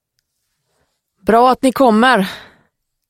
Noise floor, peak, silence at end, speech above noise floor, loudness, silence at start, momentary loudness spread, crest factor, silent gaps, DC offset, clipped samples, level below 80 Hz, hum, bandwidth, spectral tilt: -70 dBFS; 0 dBFS; 0.7 s; 58 dB; -13 LUFS; 1.25 s; 13 LU; 16 dB; none; under 0.1%; under 0.1%; -50 dBFS; none; 16.5 kHz; -5 dB/octave